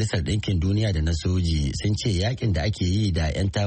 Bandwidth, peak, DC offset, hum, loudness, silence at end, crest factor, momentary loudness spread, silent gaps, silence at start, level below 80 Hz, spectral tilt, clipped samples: 8.8 kHz; -12 dBFS; under 0.1%; none; -24 LUFS; 0 s; 10 dB; 2 LU; none; 0 s; -32 dBFS; -6 dB/octave; under 0.1%